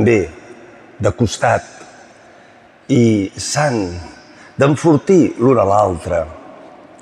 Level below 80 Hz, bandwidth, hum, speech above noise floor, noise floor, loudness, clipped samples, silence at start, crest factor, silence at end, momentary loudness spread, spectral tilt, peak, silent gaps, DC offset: -44 dBFS; 12.5 kHz; none; 31 dB; -45 dBFS; -15 LUFS; under 0.1%; 0 s; 14 dB; 0.35 s; 17 LU; -6 dB/octave; -2 dBFS; none; under 0.1%